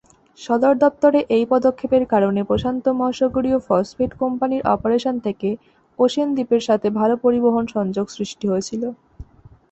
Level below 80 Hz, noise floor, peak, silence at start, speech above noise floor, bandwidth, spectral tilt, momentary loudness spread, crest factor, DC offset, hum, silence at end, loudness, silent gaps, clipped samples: -48 dBFS; -45 dBFS; -4 dBFS; 0.4 s; 27 dB; 8.2 kHz; -6.5 dB/octave; 9 LU; 16 dB; under 0.1%; none; 0.5 s; -19 LUFS; none; under 0.1%